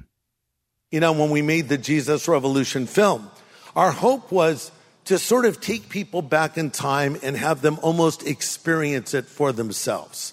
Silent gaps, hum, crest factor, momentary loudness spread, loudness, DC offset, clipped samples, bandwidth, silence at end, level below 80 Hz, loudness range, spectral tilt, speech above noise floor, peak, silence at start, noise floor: none; none; 18 dB; 8 LU; -22 LUFS; under 0.1%; under 0.1%; 16 kHz; 0 s; -64 dBFS; 2 LU; -4.5 dB/octave; 57 dB; -4 dBFS; 0.9 s; -78 dBFS